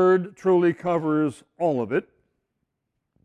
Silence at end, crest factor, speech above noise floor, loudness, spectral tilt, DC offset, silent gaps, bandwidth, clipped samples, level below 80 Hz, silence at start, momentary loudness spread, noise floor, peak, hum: 1.25 s; 14 dB; 57 dB; -23 LUFS; -8 dB/octave; under 0.1%; none; 9.6 kHz; under 0.1%; -66 dBFS; 0 s; 7 LU; -80 dBFS; -10 dBFS; none